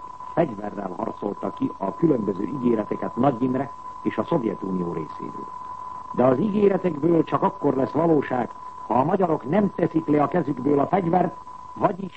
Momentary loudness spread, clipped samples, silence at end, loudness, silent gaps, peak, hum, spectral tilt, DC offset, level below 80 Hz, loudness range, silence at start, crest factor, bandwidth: 12 LU; under 0.1%; 0 s; -24 LUFS; none; -6 dBFS; none; -9.5 dB/octave; 0.4%; -58 dBFS; 4 LU; 0 s; 18 dB; 8.4 kHz